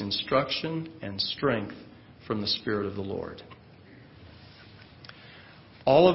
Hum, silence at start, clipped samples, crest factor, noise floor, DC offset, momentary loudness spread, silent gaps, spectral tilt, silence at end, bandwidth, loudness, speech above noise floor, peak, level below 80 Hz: none; 0 s; under 0.1%; 24 dB; -51 dBFS; under 0.1%; 24 LU; none; -9 dB/octave; 0 s; 5.8 kHz; -29 LUFS; 25 dB; -6 dBFS; -58 dBFS